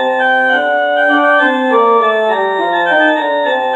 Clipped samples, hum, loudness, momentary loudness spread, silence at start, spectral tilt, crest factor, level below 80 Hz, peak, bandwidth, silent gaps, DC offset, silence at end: under 0.1%; none; -11 LUFS; 4 LU; 0 s; -4 dB/octave; 12 dB; -72 dBFS; 0 dBFS; 9.2 kHz; none; under 0.1%; 0 s